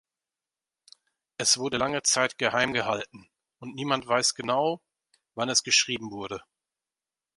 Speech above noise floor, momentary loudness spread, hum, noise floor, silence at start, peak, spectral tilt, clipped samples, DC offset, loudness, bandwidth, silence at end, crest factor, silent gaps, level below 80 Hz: over 63 dB; 18 LU; none; under -90 dBFS; 1.4 s; -8 dBFS; -1.5 dB/octave; under 0.1%; under 0.1%; -25 LUFS; 11.5 kHz; 1 s; 22 dB; none; -66 dBFS